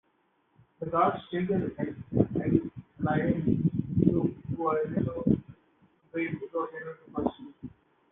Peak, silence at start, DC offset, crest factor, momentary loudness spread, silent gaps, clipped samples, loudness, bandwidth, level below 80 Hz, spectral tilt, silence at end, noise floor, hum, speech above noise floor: -8 dBFS; 0.8 s; under 0.1%; 22 dB; 13 LU; none; under 0.1%; -30 LUFS; 3.9 kHz; -54 dBFS; -11.5 dB/octave; 0.4 s; -71 dBFS; none; 42 dB